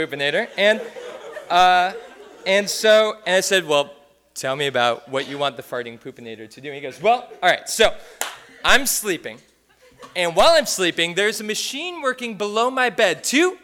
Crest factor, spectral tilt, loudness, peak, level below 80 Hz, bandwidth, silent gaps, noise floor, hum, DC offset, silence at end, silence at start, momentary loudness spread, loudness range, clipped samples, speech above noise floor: 20 dB; -2 dB/octave; -19 LUFS; 0 dBFS; -50 dBFS; 18 kHz; none; -54 dBFS; none; under 0.1%; 0.05 s; 0 s; 19 LU; 5 LU; under 0.1%; 34 dB